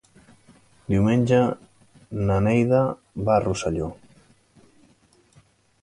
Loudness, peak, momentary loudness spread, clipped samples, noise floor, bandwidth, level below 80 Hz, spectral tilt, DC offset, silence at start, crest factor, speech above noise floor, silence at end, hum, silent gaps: -22 LUFS; -6 dBFS; 14 LU; under 0.1%; -59 dBFS; 11.5 kHz; -46 dBFS; -7.5 dB/octave; under 0.1%; 0.9 s; 18 dB; 38 dB; 1.9 s; none; none